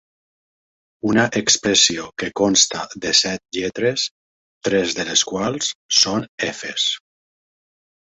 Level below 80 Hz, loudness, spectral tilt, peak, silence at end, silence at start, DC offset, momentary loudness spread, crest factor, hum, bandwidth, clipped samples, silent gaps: -56 dBFS; -18 LUFS; -2 dB/octave; 0 dBFS; 1.15 s; 1.05 s; under 0.1%; 11 LU; 20 dB; none; 8.4 kHz; under 0.1%; 4.11-4.61 s, 5.75-5.89 s, 6.29-6.38 s